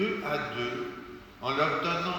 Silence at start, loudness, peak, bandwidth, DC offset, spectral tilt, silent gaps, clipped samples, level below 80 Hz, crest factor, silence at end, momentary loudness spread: 0 s; -31 LUFS; -14 dBFS; over 20 kHz; under 0.1%; -5.5 dB/octave; none; under 0.1%; -60 dBFS; 18 dB; 0 s; 14 LU